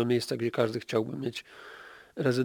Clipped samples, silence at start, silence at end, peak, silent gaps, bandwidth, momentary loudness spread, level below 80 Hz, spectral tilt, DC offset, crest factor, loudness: under 0.1%; 0 s; 0 s; -10 dBFS; none; 19 kHz; 18 LU; -72 dBFS; -6 dB/octave; under 0.1%; 20 dB; -31 LUFS